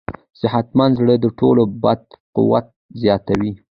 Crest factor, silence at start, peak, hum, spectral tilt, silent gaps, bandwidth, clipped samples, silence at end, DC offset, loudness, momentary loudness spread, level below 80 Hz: 16 dB; 0.1 s; -2 dBFS; none; -9.5 dB/octave; 2.20-2.33 s, 2.76-2.89 s; 6.4 kHz; under 0.1%; 0.2 s; under 0.1%; -17 LUFS; 9 LU; -46 dBFS